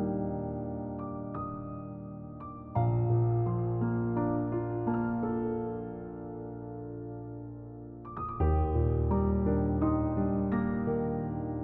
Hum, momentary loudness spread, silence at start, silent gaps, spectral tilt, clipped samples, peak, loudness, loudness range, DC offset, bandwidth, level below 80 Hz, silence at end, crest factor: none; 14 LU; 0 s; none; -11.5 dB/octave; under 0.1%; -16 dBFS; -32 LUFS; 6 LU; under 0.1%; 3 kHz; -40 dBFS; 0 s; 14 dB